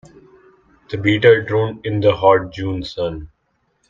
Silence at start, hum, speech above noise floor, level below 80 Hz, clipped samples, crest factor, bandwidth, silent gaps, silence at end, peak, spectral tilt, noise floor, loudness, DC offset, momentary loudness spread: 0.9 s; none; 50 dB; -46 dBFS; under 0.1%; 18 dB; 7.4 kHz; none; 0.65 s; 0 dBFS; -7.5 dB/octave; -66 dBFS; -17 LUFS; under 0.1%; 12 LU